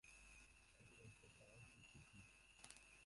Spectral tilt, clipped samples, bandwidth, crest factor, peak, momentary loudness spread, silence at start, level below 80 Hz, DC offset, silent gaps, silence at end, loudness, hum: -3 dB/octave; under 0.1%; 11.5 kHz; 32 dB; -36 dBFS; 4 LU; 0.05 s; -76 dBFS; under 0.1%; none; 0 s; -65 LUFS; none